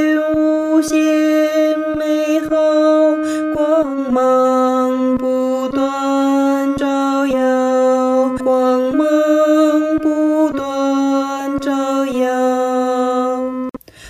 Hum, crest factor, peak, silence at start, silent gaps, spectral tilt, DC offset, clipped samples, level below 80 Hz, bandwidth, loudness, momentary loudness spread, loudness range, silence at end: none; 12 dB; -4 dBFS; 0 s; none; -4.5 dB/octave; under 0.1%; under 0.1%; -50 dBFS; 15 kHz; -15 LUFS; 5 LU; 2 LU; 0 s